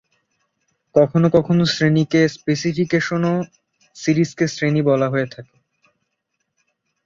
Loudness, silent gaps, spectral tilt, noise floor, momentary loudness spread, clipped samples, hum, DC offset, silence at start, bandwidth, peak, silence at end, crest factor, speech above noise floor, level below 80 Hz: -18 LUFS; none; -6.5 dB/octave; -75 dBFS; 7 LU; under 0.1%; none; under 0.1%; 0.95 s; 7.6 kHz; -2 dBFS; 1.6 s; 18 dB; 57 dB; -56 dBFS